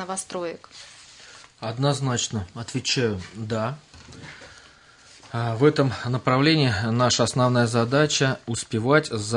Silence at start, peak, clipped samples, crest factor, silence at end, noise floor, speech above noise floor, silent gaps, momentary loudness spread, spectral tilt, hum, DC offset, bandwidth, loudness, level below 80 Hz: 0 s; -4 dBFS; under 0.1%; 20 dB; 0 s; -51 dBFS; 28 dB; none; 22 LU; -4.5 dB/octave; none; under 0.1%; 11 kHz; -23 LUFS; -60 dBFS